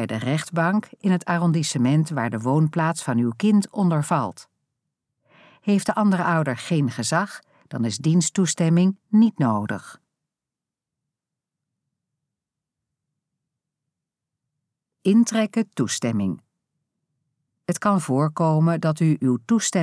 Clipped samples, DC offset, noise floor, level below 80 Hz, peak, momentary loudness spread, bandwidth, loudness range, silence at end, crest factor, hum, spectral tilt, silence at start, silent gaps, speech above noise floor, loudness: under 0.1%; under 0.1%; -88 dBFS; -72 dBFS; -6 dBFS; 8 LU; 11 kHz; 5 LU; 0 s; 16 dB; none; -6 dB/octave; 0 s; none; 67 dB; -22 LUFS